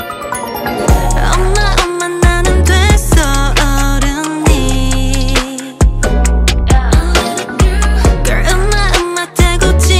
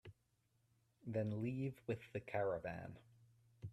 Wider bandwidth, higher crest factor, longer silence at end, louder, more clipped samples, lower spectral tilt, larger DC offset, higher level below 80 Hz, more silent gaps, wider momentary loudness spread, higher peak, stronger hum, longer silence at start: first, 15.5 kHz vs 12.5 kHz; second, 10 dB vs 18 dB; about the same, 0 s vs 0 s; first, -12 LUFS vs -44 LUFS; neither; second, -4.5 dB/octave vs -9 dB/octave; neither; first, -12 dBFS vs -74 dBFS; neither; second, 5 LU vs 15 LU; first, 0 dBFS vs -28 dBFS; neither; about the same, 0 s vs 0.05 s